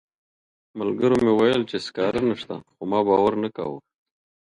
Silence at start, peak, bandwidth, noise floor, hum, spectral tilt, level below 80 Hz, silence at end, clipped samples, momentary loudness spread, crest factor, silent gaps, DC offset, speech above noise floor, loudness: 0.75 s; -6 dBFS; 11 kHz; under -90 dBFS; none; -6.5 dB/octave; -56 dBFS; 0.6 s; under 0.1%; 14 LU; 18 dB; none; under 0.1%; over 68 dB; -22 LUFS